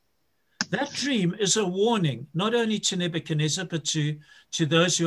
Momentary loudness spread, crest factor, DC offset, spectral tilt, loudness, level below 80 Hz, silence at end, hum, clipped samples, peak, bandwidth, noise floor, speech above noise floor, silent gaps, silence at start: 7 LU; 20 dB; under 0.1%; -4 dB/octave; -25 LUFS; -66 dBFS; 0 s; none; under 0.1%; -6 dBFS; 12.5 kHz; -74 dBFS; 49 dB; none; 0.6 s